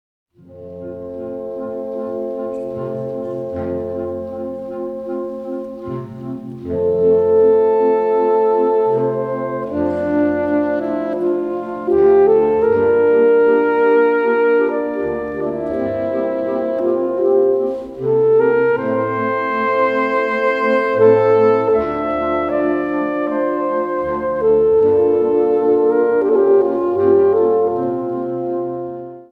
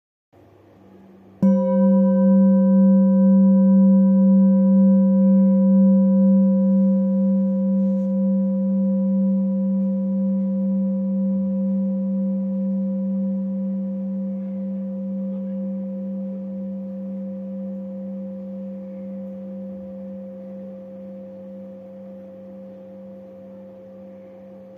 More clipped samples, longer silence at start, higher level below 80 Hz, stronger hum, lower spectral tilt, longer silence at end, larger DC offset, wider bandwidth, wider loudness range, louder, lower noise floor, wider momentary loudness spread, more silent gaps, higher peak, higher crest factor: neither; second, 0.5 s vs 1.4 s; first, -50 dBFS vs -72 dBFS; neither; second, -9 dB/octave vs -13.5 dB/octave; about the same, 0.1 s vs 0 s; neither; first, 5 kHz vs 1.6 kHz; second, 11 LU vs 21 LU; first, -16 LUFS vs -19 LUFS; second, -36 dBFS vs -50 dBFS; second, 13 LU vs 22 LU; neither; first, -2 dBFS vs -8 dBFS; about the same, 14 dB vs 12 dB